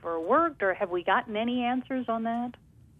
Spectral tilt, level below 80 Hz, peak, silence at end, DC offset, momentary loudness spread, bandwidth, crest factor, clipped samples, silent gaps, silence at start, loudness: -7 dB/octave; -64 dBFS; -10 dBFS; 0.45 s; under 0.1%; 7 LU; 3.9 kHz; 18 dB; under 0.1%; none; 0 s; -28 LUFS